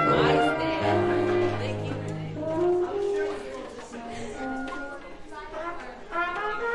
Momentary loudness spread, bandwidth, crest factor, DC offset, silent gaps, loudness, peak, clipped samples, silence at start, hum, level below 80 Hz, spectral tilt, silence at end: 16 LU; 11 kHz; 18 dB; under 0.1%; none; -28 LUFS; -10 dBFS; under 0.1%; 0 s; none; -50 dBFS; -6.5 dB/octave; 0 s